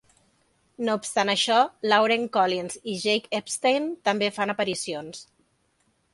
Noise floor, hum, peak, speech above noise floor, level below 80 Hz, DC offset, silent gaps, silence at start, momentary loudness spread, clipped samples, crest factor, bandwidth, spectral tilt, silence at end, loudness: -69 dBFS; none; -6 dBFS; 44 dB; -70 dBFS; under 0.1%; none; 0.8 s; 11 LU; under 0.1%; 20 dB; 11.5 kHz; -3 dB/octave; 0.9 s; -24 LUFS